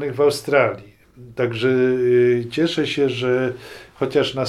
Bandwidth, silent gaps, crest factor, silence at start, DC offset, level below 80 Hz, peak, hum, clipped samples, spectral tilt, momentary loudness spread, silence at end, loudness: 13 kHz; none; 18 dB; 0 s; under 0.1%; -56 dBFS; -2 dBFS; none; under 0.1%; -6 dB/octave; 12 LU; 0 s; -19 LUFS